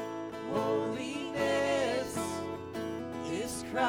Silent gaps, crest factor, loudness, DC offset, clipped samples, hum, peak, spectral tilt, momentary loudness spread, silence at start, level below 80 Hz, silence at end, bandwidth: none; 16 dB; -34 LUFS; under 0.1%; under 0.1%; none; -16 dBFS; -4.5 dB/octave; 9 LU; 0 s; -64 dBFS; 0 s; over 20 kHz